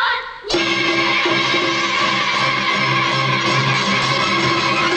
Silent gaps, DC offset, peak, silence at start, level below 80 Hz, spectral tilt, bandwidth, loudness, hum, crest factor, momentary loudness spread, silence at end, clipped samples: none; under 0.1%; -6 dBFS; 0 s; -50 dBFS; -3.5 dB/octave; 9.8 kHz; -16 LUFS; none; 12 dB; 2 LU; 0 s; under 0.1%